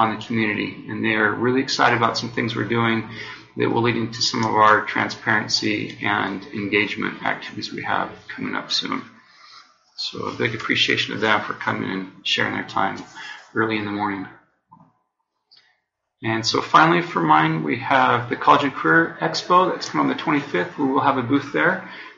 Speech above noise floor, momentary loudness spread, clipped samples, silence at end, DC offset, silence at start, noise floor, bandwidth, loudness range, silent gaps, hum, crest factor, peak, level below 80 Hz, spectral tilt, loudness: 54 dB; 12 LU; under 0.1%; 0.05 s; under 0.1%; 0 s; -74 dBFS; 7.8 kHz; 8 LU; none; none; 20 dB; -2 dBFS; -62 dBFS; -2.5 dB/octave; -21 LUFS